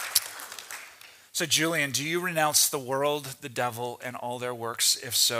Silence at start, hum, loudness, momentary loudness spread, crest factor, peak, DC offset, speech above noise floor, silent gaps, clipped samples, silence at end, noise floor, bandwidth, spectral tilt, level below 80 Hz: 0 s; none; -26 LUFS; 16 LU; 26 dB; -4 dBFS; under 0.1%; 23 dB; none; under 0.1%; 0 s; -51 dBFS; 16 kHz; -1.5 dB/octave; -76 dBFS